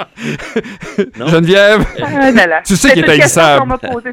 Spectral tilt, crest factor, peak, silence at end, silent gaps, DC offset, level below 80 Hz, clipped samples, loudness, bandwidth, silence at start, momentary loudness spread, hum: -4 dB/octave; 10 dB; 0 dBFS; 0 s; none; under 0.1%; -32 dBFS; 0.4%; -9 LUFS; 18 kHz; 0 s; 14 LU; none